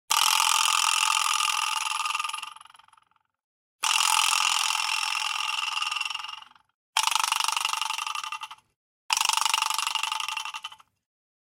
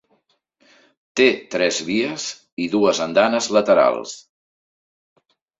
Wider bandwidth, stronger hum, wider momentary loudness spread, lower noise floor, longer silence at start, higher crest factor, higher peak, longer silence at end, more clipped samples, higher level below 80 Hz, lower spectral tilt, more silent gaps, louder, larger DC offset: first, 17 kHz vs 8 kHz; neither; about the same, 15 LU vs 13 LU; about the same, -65 dBFS vs -65 dBFS; second, 0.1 s vs 1.15 s; about the same, 24 dB vs 20 dB; about the same, -4 dBFS vs -2 dBFS; second, 0.65 s vs 1.4 s; neither; second, -82 dBFS vs -64 dBFS; second, 5.5 dB/octave vs -3.5 dB/octave; first, 3.44-3.79 s, 6.74-6.93 s, 8.76-9.09 s vs 2.52-2.57 s; second, -24 LUFS vs -19 LUFS; neither